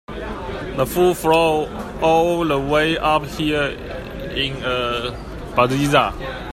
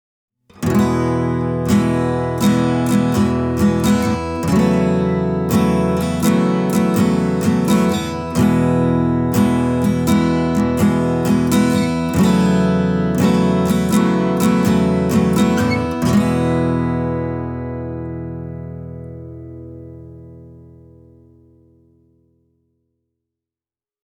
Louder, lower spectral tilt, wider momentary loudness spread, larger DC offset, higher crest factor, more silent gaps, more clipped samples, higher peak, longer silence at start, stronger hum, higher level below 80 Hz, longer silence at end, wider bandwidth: second, -19 LUFS vs -16 LUFS; second, -5 dB/octave vs -7 dB/octave; about the same, 13 LU vs 12 LU; neither; first, 20 dB vs 14 dB; neither; neither; about the same, 0 dBFS vs -2 dBFS; second, 0.1 s vs 0.6 s; neither; about the same, -36 dBFS vs -38 dBFS; second, 0.05 s vs 3.45 s; second, 16 kHz vs over 20 kHz